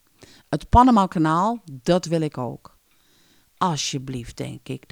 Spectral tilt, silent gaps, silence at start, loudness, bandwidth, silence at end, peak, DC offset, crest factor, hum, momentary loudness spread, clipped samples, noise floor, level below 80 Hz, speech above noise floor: -5.5 dB/octave; none; 0.5 s; -21 LUFS; 15.5 kHz; 0.15 s; -4 dBFS; under 0.1%; 20 dB; none; 18 LU; under 0.1%; -60 dBFS; -36 dBFS; 39 dB